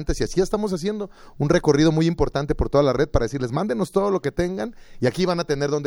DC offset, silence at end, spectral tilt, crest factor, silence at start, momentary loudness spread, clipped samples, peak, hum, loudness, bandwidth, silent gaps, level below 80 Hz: under 0.1%; 0 s; -6.5 dB/octave; 16 dB; 0 s; 9 LU; under 0.1%; -4 dBFS; none; -22 LUFS; 16.5 kHz; none; -34 dBFS